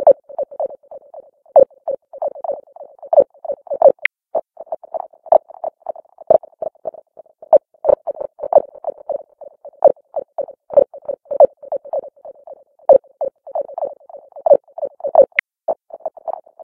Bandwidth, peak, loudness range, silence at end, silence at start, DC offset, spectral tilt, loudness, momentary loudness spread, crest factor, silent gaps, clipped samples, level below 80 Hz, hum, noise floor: 3.8 kHz; 0 dBFS; 2 LU; 0 s; 0 s; under 0.1%; -7 dB/octave; -18 LUFS; 17 LU; 18 dB; none; under 0.1%; -60 dBFS; none; -44 dBFS